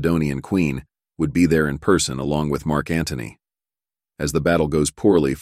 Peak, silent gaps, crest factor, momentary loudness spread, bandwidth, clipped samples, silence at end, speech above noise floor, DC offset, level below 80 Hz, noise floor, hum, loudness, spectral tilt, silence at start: -4 dBFS; none; 18 dB; 10 LU; 15.5 kHz; under 0.1%; 0 s; over 70 dB; under 0.1%; -40 dBFS; under -90 dBFS; none; -20 LUFS; -5.5 dB/octave; 0 s